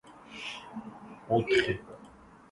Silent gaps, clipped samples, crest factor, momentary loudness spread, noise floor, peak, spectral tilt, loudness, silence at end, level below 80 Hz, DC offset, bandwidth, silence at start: none; under 0.1%; 20 dB; 23 LU; -54 dBFS; -14 dBFS; -5.5 dB/octave; -31 LUFS; 0.45 s; -60 dBFS; under 0.1%; 11.5 kHz; 0.05 s